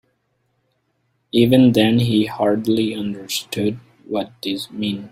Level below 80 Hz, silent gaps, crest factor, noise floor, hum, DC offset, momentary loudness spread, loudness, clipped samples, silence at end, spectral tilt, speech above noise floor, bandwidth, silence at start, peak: -54 dBFS; none; 18 dB; -68 dBFS; none; under 0.1%; 13 LU; -19 LUFS; under 0.1%; 0.05 s; -6 dB/octave; 50 dB; 16 kHz; 1.35 s; -2 dBFS